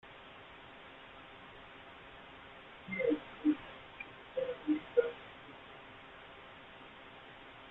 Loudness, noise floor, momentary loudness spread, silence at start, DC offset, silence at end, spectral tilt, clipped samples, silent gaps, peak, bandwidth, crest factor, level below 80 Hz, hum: -37 LUFS; -54 dBFS; 18 LU; 0.05 s; under 0.1%; 0 s; -7.5 dB/octave; under 0.1%; none; -16 dBFS; 4.1 kHz; 24 dB; -70 dBFS; none